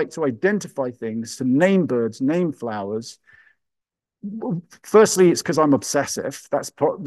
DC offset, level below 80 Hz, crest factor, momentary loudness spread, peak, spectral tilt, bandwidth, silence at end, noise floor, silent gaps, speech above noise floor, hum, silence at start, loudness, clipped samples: under 0.1%; -66 dBFS; 18 dB; 14 LU; -4 dBFS; -5 dB/octave; 12.5 kHz; 0 s; -85 dBFS; none; 64 dB; none; 0 s; -21 LUFS; under 0.1%